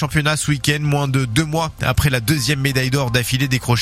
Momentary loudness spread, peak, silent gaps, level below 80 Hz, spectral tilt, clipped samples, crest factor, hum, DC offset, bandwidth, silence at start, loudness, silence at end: 2 LU; -2 dBFS; none; -36 dBFS; -4.5 dB/octave; under 0.1%; 16 dB; none; under 0.1%; 16 kHz; 0 s; -18 LUFS; 0 s